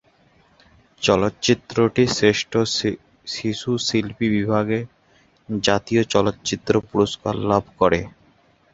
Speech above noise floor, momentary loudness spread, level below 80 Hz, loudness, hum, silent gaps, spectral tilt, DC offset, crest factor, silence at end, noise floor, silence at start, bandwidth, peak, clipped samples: 37 dB; 8 LU; -48 dBFS; -21 LUFS; none; none; -5 dB/octave; under 0.1%; 22 dB; 0.65 s; -58 dBFS; 1 s; 8 kHz; 0 dBFS; under 0.1%